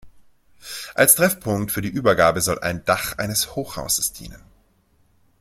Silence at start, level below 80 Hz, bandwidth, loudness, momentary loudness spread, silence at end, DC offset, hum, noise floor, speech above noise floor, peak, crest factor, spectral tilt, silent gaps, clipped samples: 0.05 s; -48 dBFS; 16.5 kHz; -20 LUFS; 14 LU; 1.05 s; under 0.1%; none; -61 dBFS; 40 dB; 0 dBFS; 22 dB; -3 dB/octave; none; under 0.1%